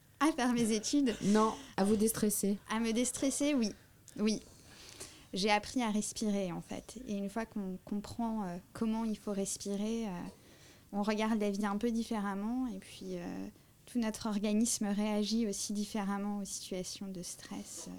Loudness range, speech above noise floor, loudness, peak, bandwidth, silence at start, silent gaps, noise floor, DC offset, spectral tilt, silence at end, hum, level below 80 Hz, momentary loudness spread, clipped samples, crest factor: 6 LU; 24 dB; -35 LUFS; -16 dBFS; 18.5 kHz; 0.2 s; none; -59 dBFS; under 0.1%; -4.5 dB/octave; 0 s; none; -60 dBFS; 13 LU; under 0.1%; 18 dB